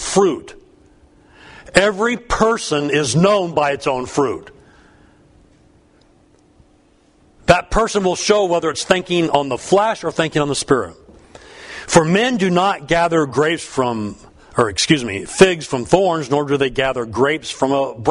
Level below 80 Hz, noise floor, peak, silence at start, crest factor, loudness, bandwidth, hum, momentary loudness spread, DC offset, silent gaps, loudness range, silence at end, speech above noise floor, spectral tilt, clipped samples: -40 dBFS; -54 dBFS; 0 dBFS; 0 s; 18 dB; -17 LUFS; 11 kHz; none; 7 LU; under 0.1%; none; 6 LU; 0 s; 37 dB; -4.5 dB/octave; under 0.1%